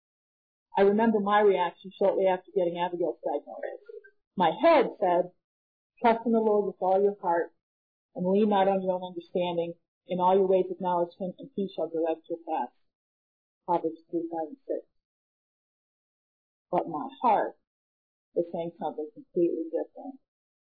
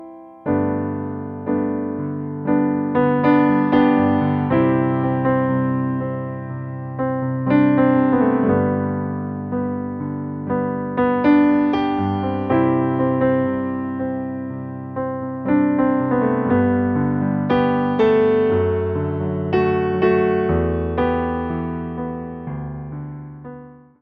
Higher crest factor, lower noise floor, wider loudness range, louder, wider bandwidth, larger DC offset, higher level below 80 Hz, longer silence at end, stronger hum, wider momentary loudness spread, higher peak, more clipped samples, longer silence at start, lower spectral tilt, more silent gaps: about the same, 16 dB vs 18 dB; first, under -90 dBFS vs -40 dBFS; first, 9 LU vs 4 LU; second, -28 LUFS vs -19 LUFS; about the same, 4.9 kHz vs 5.2 kHz; neither; second, -72 dBFS vs -44 dBFS; first, 0.6 s vs 0.25 s; neither; about the same, 14 LU vs 13 LU; second, -12 dBFS vs -2 dBFS; neither; first, 0.75 s vs 0 s; about the same, -10 dB/octave vs -10.5 dB/octave; first, 4.27-4.31 s, 5.44-5.90 s, 7.63-8.09 s, 9.88-10.01 s, 12.95-13.61 s, 15.05-16.66 s, 17.67-18.32 s vs none